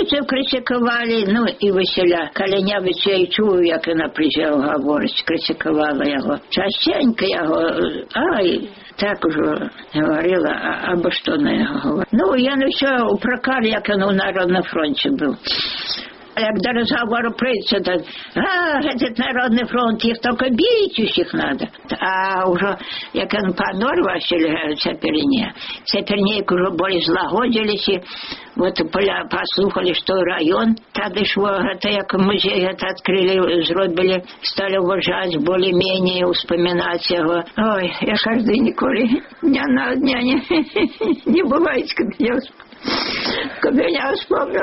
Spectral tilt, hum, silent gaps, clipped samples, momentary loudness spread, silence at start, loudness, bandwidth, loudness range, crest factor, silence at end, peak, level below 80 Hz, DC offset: -2.5 dB/octave; none; none; under 0.1%; 5 LU; 0 s; -18 LUFS; 6 kHz; 2 LU; 14 dB; 0 s; -6 dBFS; -50 dBFS; under 0.1%